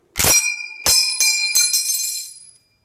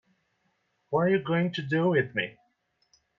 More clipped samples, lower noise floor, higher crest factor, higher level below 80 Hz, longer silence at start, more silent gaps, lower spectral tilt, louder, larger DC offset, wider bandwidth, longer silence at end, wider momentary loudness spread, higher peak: neither; second, -47 dBFS vs -74 dBFS; about the same, 16 dB vs 18 dB; first, -44 dBFS vs -70 dBFS; second, 0.15 s vs 0.9 s; neither; second, 1 dB/octave vs -8 dB/octave; first, -15 LUFS vs -27 LUFS; neither; first, 16 kHz vs 7 kHz; second, 0.4 s vs 0.9 s; first, 10 LU vs 7 LU; first, -2 dBFS vs -12 dBFS